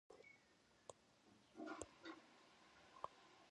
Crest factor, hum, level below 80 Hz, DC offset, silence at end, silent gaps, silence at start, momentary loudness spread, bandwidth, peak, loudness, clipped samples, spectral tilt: 28 dB; none; -84 dBFS; under 0.1%; 0 s; none; 0.1 s; 13 LU; 10.5 kHz; -32 dBFS; -60 LUFS; under 0.1%; -3.5 dB/octave